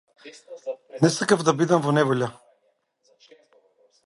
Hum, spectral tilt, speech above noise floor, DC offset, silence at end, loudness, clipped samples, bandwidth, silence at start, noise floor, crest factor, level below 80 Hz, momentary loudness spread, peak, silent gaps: none; -5.5 dB/octave; 47 dB; under 0.1%; 1.75 s; -22 LUFS; under 0.1%; 11.5 kHz; 0.25 s; -69 dBFS; 20 dB; -68 dBFS; 16 LU; -4 dBFS; none